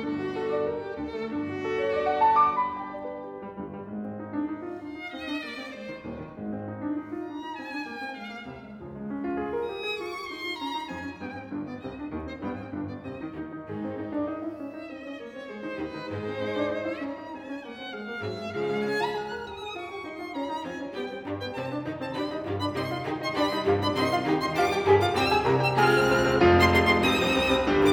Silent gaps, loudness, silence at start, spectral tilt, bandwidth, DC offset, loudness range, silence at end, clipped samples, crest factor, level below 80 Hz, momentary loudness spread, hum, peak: none; -28 LUFS; 0 s; -5.5 dB/octave; 19.5 kHz; under 0.1%; 13 LU; 0 s; under 0.1%; 20 dB; -54 dBFS; 16 LU; none; -8 dBFS